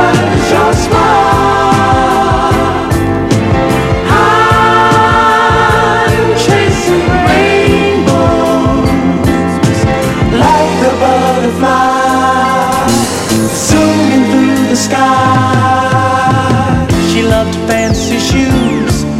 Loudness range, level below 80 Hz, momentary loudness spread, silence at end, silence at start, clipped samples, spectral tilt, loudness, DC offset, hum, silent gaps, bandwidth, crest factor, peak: 2 LU; -26 dBFS; 4 LU; 0 s; 0 s; under 0.1%; -5 dB/octave; -9 LUFS; under 0.1%; none; none; 16 kHz; 8 dB; 0 dBFS